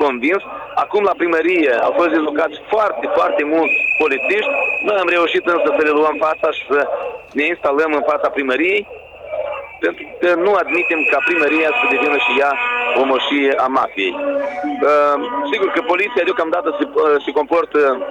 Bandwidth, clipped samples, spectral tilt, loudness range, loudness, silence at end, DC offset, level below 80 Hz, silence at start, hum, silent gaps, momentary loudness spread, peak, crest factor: 9.4 kHz; under 0.1%; -4.5 dB/octave; 3 LU; -16 LUFS; 0 s; under 0.1%; -56 dBFS; 0 s; none; none; 7 LU; -6 dBFS; 10 dB